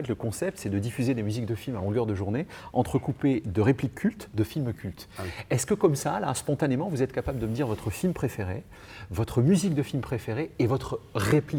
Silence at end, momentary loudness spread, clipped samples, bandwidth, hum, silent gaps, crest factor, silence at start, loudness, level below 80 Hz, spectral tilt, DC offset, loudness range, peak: 0 s; 9 LU; under 0.1%; over 20 kHz; none; none; 18 dB; 0 s; -28 LUFS; -50 dBFS; -6.5 dB/octave; under 0.1%; 1 LU; -10 dBFS